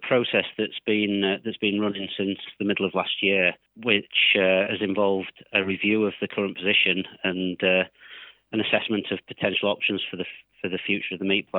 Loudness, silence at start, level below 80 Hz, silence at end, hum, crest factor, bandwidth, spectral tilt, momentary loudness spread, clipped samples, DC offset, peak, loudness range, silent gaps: -24 LUFS; 0 s; -72 dBFS; 0 s; none; 22 dB; 4.1 kHz; -8.5 dB/octave; 11 LU; under 0.1%; under 0.1%; -4 dBFS; 4 LU; none